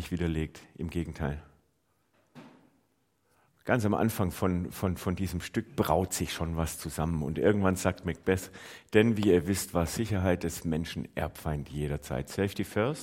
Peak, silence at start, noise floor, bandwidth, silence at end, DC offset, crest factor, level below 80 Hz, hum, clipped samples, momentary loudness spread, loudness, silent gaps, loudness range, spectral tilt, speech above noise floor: -8 dBFS; 0 s; -73 dBFS; 16.5 kHz; 0 s; under 0.1%; 24 dB; -50 dBFS; none; under 0.1%; 10 LU; -30 LUFS; none; 8 LU; -6 dB/octave; 44 dB